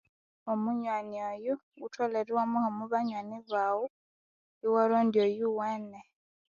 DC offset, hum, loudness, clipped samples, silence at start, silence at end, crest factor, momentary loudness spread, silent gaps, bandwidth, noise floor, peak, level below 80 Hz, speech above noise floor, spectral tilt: under 0.1%; none; -31 LUFS; under 0.1%; 0.45 s; 0.5 s; 18 dB; 13 LU; 1.63-1.72 s, 3.90-4.61 s; 7.2 kHz; under -90 dBFS; -14 dBFS; -80 dBFS; over 59 dB; -7 dB/octave